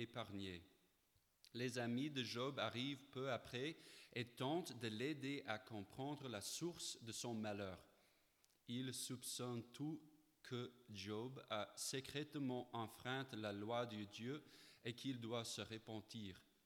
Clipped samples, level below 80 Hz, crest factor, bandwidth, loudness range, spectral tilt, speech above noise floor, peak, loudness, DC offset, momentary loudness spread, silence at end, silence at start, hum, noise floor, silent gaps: under 0.1%; -84 dBFS; 22 dB; 19 kHz; 3 LU; -4 dB/octave; 32 dB; -28 dBFS; -49 LUFS; under 0.1%; 9 LU; 0.25 s; 0 s; none; -81 dBFS; none